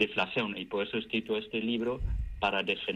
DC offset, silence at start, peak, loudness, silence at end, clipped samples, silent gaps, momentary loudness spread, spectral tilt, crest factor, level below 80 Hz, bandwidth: under 0.1%; 0 s; -14 dBFS; -32 LUFS; 0 s; under 0.1%; none; 5 LU; -6 dB/octave; 18 dB; -42 dBFS; 9.2 kHz